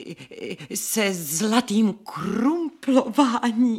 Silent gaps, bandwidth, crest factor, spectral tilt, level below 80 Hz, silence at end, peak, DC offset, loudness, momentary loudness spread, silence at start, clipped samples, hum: none; 17 kHz; 18 dB; -4 dB/octave; -66 dBFS; 0 s; -4 dBFS; under 0.1%; -22 LUFS; 13 LU; 0 s; under 0.1%; none